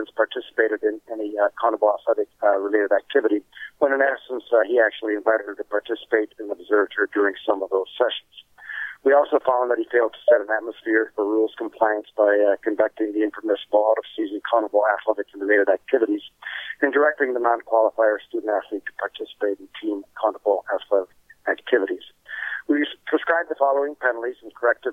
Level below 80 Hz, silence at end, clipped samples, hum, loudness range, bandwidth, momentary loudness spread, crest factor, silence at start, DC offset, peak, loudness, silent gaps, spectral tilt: -72 dBFS; 0 s; under 0.1%; none; 3 LU; 3.8 kHz; 11 LU; 16 dB; 0 s; under 0.1%; -6 dBFS; -22 LUFS; none; -5 dB/octave